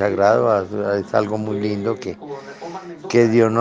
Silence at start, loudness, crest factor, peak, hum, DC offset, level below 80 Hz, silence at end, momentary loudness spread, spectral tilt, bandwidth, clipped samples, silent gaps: 0 s; -19 LUFS; 18 dB; -2 dBFS; none; under 0.1%; -64 dBFS; 0 s; 18 LU; -7 dB/octave; 7.8 kHz; under 0.1%; none